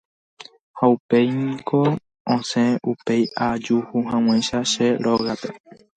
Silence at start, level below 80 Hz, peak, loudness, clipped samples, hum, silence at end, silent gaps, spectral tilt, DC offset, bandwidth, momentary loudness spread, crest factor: 0.4 s; -58 dBFS; -4 dBFS; -21 LUFS; under 0.1%; none; 0.4 s; 0.61-0.74 s, 1.00-1.09 s, 2.20-2.25 s; -5.5 dB/octave; under 0.1%; 9.2 kHz; 6 LU; 18 dB